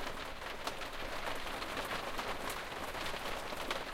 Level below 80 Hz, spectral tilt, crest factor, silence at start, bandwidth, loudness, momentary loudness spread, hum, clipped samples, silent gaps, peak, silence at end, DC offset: -50 dBFS; -2.5 dB/octave; 18 dB; 0 s; 16.5 kHz; -40 LUFS; 3 LU; none; under 0.1%; none; -22 dBFS; 0 s; under 0.1%